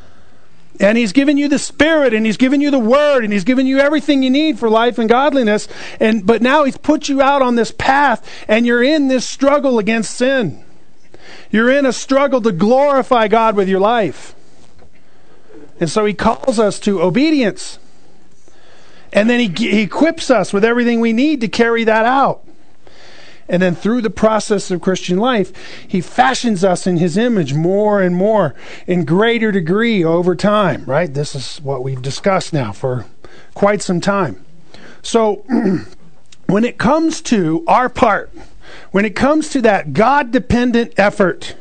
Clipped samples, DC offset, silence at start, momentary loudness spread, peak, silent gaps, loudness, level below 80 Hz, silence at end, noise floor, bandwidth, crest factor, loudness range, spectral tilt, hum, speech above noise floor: under 0.1%; 3%; 0.8 s; 7 LU; 0 dBFS; none; -14 LUFS; -44 dBFS; 0.05 s; -50 dBFS; 9.4 kHz; 14 dB; 5 LU; -5.5 dB/octave; none; 36 dB